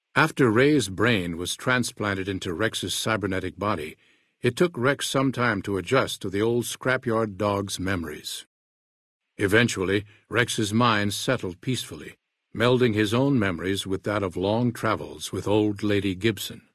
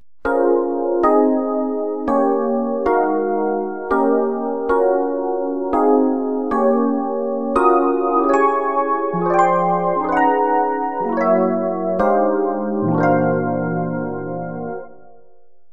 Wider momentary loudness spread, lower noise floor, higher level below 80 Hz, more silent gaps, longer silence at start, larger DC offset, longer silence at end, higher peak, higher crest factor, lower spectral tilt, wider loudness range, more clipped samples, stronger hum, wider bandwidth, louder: about the same, 9 LU vs 7 LU; first, under -90 dBFS vs -56 dBFS; second, -58 dBFS vs -50 dBFS; first, 8.46-9.20 s vs none; about the same, 0.15 s vs 0.25 s; second, under 0.1% vs 1%; second, 0.15 s vs 0.85 s; about the same, -4 dBFS vs -2 dBFS; about the same, 20 dB vs 16 dB; second, -5 dB/octave vs -9 dB/octave; about the same, 3 LU vs 2 LU; neither; neither; first, 12 kHz vs 9 kHz; second, -25 LUFS vs -18 LUFS